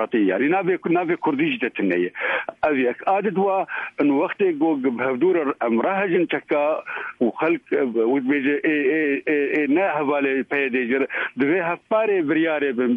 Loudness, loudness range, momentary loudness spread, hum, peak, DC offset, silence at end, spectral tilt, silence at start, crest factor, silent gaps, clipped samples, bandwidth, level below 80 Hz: -21 LUFS; 1 LU; 3 LU; none; -8 dBFS; under 0.1%; 0 s; -8.5 dB/octave; 0 s; 12 dB; none; under 0.1%; 4 kHz; -68 dBFS